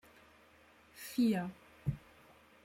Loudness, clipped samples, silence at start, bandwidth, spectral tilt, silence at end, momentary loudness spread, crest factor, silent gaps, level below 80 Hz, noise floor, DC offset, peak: -37 LUFS; under 0.1%; 0.95 s; 16 kHz; -6.5 dB/octave; 0.65 s; 18 LU; 18 dB; none; -62 dBFS; -64 dBFS; under 0.1%; -22 dBFS